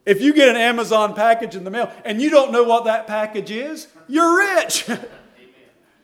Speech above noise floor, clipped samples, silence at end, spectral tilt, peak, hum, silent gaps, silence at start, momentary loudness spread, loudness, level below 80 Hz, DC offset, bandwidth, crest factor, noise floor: 37 dB; under 0.1%; 0.95 s; -3 dB/octave; 0 dBFS; none; none; 0.05 s; 14 LU; -17 LUFS; -68 dBFS; under 0.1%; 17 kHz; 18 dB; -54 dBFS